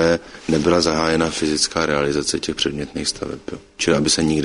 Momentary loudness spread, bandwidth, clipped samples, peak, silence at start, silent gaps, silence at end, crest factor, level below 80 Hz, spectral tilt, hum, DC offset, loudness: 7 LU; 11 kHz; under 0.1%; -2 dBFS; 0 s; none; 0 s; 16 dB; -42 dBFS; -3.5 dB/octave; none; under 0.1%; -19 LUFS